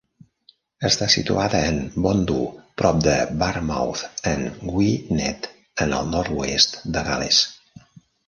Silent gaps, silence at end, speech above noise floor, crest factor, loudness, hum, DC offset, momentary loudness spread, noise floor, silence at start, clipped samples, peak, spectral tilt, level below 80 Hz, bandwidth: none; 0.75 s; 36 dB; 22 dB; -21 LUFS; none; under 0.1%; 9 LU; -58 dBFS; 0.8 s; under 0.1%; 0 dBFS; -4 dB/octave; -40 dBFS; 11 kHz